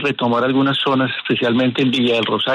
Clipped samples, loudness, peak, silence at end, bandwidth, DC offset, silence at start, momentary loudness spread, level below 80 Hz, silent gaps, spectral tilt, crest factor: under 0.1%; -17 LUFS; -4 dBFS; 0 s; 10 kHz; under 0.1%; 0 s; 3 LU; -60 dBFS; none; -6.5 dB/octave; 12 dB